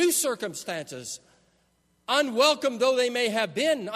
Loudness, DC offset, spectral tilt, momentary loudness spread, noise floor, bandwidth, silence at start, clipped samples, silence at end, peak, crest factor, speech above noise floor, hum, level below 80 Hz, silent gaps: -25 LUFS; under 0.1%; -2 dB/octave; 15 LU; -68 dBFS; 13.5 kHz; 0 s; under 0.1%; 0 s; -6 dBFS; 20 dB; 42 dB; none; -76 dBFS; none